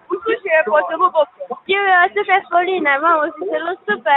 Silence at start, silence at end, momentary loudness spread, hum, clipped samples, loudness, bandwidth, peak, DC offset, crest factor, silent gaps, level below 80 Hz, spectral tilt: 0.1 s; 0 s; 8 LU; none; under 0.1%; -16 LUFS; 4.1 kHz; 0 dBFS; under 0.1%; 16 dB; none; -68 dBFS; -7.5 dB/octave